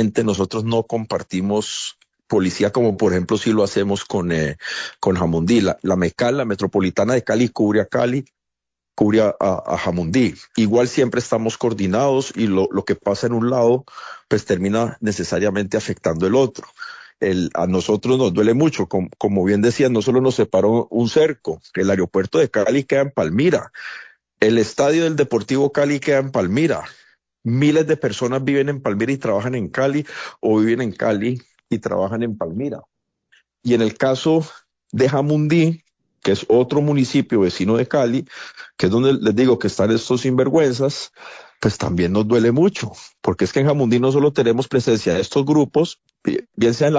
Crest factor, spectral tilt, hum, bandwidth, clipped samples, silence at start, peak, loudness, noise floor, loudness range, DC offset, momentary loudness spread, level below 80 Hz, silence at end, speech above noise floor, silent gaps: 16 dB; -6 dB/octave; none; 8 kHz; under 0.1%; 0 s; -2 dBFS; -19 LUFS; -82 dBFS; 3 LU; under 0.1%; 9 LU; -46 dBFS; 0 s; 64 dB; none